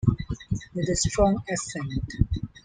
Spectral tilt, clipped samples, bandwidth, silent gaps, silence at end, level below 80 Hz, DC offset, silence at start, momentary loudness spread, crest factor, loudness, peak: -5.5 dB/octave; under 0.1%; 9.8 kHz; none; 0.05 s; -36 dBFS; under 0.1%; 0 s; 10 LU; 20 dB; -27 LUFS; -6 dBFS